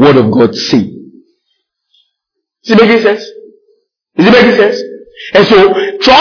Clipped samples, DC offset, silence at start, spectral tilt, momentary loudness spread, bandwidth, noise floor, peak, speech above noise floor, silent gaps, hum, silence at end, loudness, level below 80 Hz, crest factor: 2%; under 0.1%; 0 s; -5.5 dB/octave; 17 LU; 5.4 kHz; -73 dBFS; 0 dBFS; 66 dB; none; none; 0 s; -8 LUFS; -44 dBFS; 10 dB